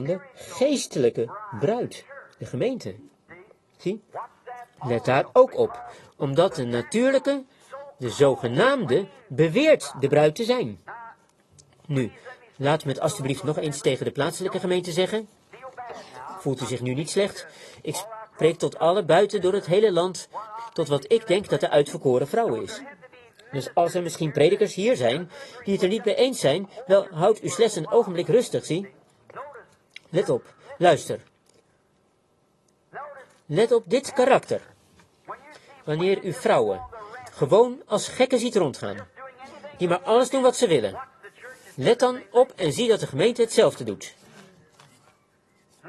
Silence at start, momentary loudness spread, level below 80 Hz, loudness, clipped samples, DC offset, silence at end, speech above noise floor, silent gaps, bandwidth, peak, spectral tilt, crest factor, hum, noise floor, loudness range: 0 s; 20 LU; -64 dBFS; -23 LUFS; under 0.1%; under 0.1%; 0 s; 43 dB; none; 12.5 kHz; -4 dBFS; -5 dB/octave; 20 dB; none; -65 dBFS; 6 LU